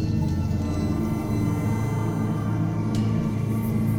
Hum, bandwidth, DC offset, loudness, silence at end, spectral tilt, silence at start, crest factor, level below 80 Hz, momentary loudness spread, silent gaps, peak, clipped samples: none; 16.5 kHz; under 0.1%; -25 LUFS; 0 s; -8 dB/octave; 0 s; 10 dB; -40 dBFS; 1 LU; none; -14 dBFS; under 0.1%